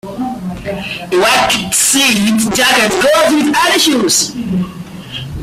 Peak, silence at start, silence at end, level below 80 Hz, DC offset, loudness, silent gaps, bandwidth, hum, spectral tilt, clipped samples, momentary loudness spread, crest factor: 0 dBFS; 0.05 s; 0 s; -40 dBFS; under 0.1%; -11 LUFS; none; 16 kHz; none; -2.5 dB/octave; under 0.1%; 13 LU; 12 dB